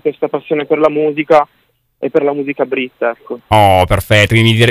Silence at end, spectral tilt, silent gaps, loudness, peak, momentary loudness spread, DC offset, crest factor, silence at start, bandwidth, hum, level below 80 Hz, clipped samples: 0 s; -6 dB/octave; none; -13 LUFS; 0 dBFS; 10 LU; under 0.1%; 12 dB; 0.05 s; 16 kHz; none; -36 dBFS; 0.3%